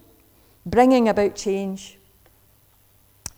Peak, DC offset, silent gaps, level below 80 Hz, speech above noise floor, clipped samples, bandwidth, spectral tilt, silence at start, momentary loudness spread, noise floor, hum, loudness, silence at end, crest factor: -4 dBFS; under 0.1%; none; -50 dBFS; 38 dB; under 0.1%; over 20 kHz; -5.5 dB/octave; 0.65 s; 23 LU; -57 dBFS; none; -20 LUFS; 1.5 s; 20 dB